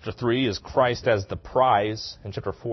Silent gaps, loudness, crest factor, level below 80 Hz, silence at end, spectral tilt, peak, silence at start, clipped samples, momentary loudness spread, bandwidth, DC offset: none; -24 LUFS; 18 dB; -50 dBFS; 0 s; -6 dB/octave; -6 dBFS; 0 s; under 0.1%; 12 LU; 6.2 kHz; under 0.1%